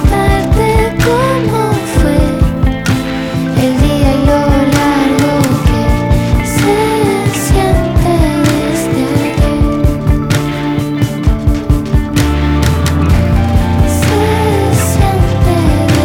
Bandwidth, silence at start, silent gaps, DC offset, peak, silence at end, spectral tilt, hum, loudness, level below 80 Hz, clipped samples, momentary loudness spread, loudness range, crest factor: 17.5 kHz; 0 s; none; under 0.1%; 0 dBFS; 0 s; -6 dB/octave; none; -12 LUFS; -16 dBFS; under 0.1%; 3 LU; 2 LU; 10 dB